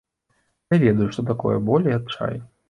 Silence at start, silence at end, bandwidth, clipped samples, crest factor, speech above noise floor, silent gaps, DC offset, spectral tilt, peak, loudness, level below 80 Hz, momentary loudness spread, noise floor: 0.7 s; 0.25 s; 9.8 kHz; under 0.1%; 16 dB; 49 dB; none; under 0.1%; -8.5 dB/octave; -6 dBFS; -21 LUFS; -52 dBFS; 10 LU; -69 dBFS